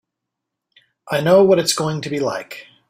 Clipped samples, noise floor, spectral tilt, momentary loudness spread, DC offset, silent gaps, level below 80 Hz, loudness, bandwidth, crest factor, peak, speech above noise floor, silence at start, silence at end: under 0.1%; -81 dBFS; -4.5 dB/octave; 14 LU; under 0.1%; none; -60 dBFS; -17 LUFS; 16 kHz; 18 dB; -2 dBFS; 64 dB; 1.05 s; 0.25 s